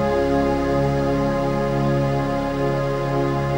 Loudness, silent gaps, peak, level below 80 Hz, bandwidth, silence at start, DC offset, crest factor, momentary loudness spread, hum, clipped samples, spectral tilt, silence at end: -21 LUFS; none; -8 dBFS; -34 dBFS; 16.5 kHz; 0 s; under 0.1%; 12 dB; 3 LU; none; under 0.1%; -7.5 dB/octave; 0 s